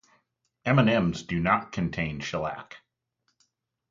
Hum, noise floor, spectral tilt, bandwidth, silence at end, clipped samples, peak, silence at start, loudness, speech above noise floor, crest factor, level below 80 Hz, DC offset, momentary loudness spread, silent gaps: none; -76 dBFS; -6.5 dB/octave; 7.6 kHz; 1.15 s; under 0.1%; -8 dBFS; 0.65 s; -26 LUFS; 50 dB; 22 dB; -52 dBFS; under 0.1%; 13 LU; none